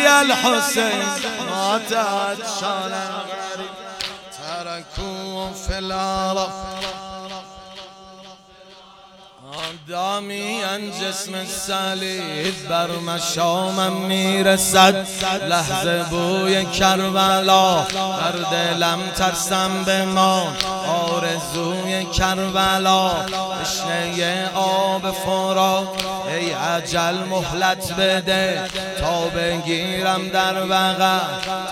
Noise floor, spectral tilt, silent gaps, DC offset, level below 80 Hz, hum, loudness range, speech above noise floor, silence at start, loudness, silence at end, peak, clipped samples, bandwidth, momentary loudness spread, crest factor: -45 dBFS; -3 dB/octave; none; under 0.1%; -44 dBFS; none; 10 LU; 25 dB; 0 s; -20 LUFS; 0 s; 0 dBFS; under 0.1%; 16.5 kHz; 12 LU; 20 dB